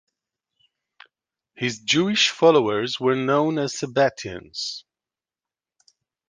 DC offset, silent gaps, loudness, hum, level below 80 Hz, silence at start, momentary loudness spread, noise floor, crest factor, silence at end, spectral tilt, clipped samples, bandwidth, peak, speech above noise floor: under 0.1%; none; -21 LUFS; none; -64 dBFS; 1.6 s; 13 LU; under -90 dBFS; 20 dB; 1.5 s; -4 dB/octave; under 0.1%; 10 kHz; -4 dBFS; over 69 dB